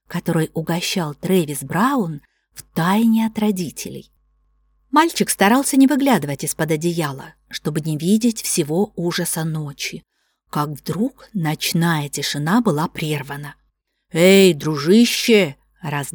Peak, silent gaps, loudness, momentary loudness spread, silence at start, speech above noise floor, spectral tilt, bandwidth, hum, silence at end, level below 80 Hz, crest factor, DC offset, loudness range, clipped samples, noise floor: -2 dBFS; none; -19 LUFS; 14 LU; 0.1 s; 49 dB; -5 dB/octave; 19.5 kHz; none; 0.05 s; -56 dBFS; 16 dB; under 0.1%; 6 LU; under 0.1%; -67 dBFS